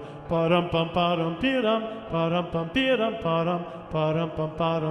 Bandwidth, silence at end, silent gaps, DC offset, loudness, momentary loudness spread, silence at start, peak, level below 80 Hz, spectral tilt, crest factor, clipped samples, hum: 8.6 kHz; 0 s; none; under 0.1%; -26 LUFS; 6 LU; 0 s; -10 dBFS; -52 dBFS; -7.5 dB/octave; 16 dB; under 0.1%; none